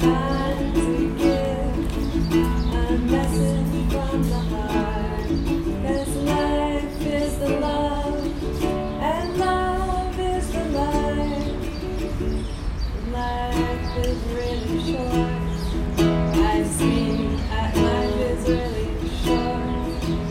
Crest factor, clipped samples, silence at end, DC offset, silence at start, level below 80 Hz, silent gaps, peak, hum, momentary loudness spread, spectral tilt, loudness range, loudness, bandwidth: 16 dB; under 0.1%; 0 s; under 0.1%; 0 s; -28 dBFS; none; -6 dBFS; none; 6 LU; -6.5 dB/octave; 4 LU; -23 LUFS; 16 kHz